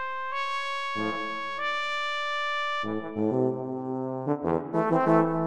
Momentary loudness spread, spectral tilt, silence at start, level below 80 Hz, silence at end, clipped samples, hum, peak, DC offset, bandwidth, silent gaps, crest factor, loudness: 8 LU; -6 dB/octave; 0 s; -64 dBFS; 0 s; under 0.1%; none; -8 dBFS; 0.7%; 10 kHz; none; 20 dB; -28 LUFS